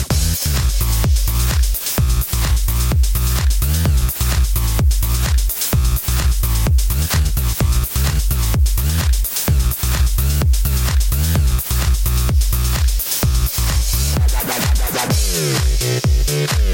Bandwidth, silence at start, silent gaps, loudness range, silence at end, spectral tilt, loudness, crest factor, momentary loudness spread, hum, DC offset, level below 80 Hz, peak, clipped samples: 17 kHz; 0 s; none; 0 LU; 0 s; -4 dB/octave; -17 LUFS; 10 dB; 1 LU; none; under 0.1%; -16 dBFS; -6 dBFS; under 0.1%